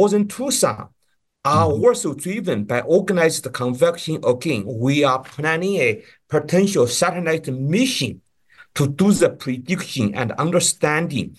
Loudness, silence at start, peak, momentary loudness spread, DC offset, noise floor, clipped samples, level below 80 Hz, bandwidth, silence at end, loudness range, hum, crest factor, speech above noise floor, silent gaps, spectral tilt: -19 LUFS; 0 s; -4 dBFS; 7 LU; under 0.1%; -52 dBFS; under 0.1%; -56 dBFS; 12.5 kHz; 0.05 s; 1 LU; none; 16 dB; 33 dB; none; -4.5 dB/octave